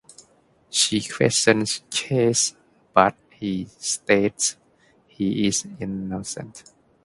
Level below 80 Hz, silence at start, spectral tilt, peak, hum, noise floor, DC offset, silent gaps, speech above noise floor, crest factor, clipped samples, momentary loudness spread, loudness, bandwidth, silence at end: -56 dBFS; 0.7 s; -3 dB/octave; 0 dBFS; none; -59 dBFS; under 0.1%; none; 37 dB; 24 dB; under 0.1%; 12 LU; -22 LUFS; 11.5 kHz; 0.45 s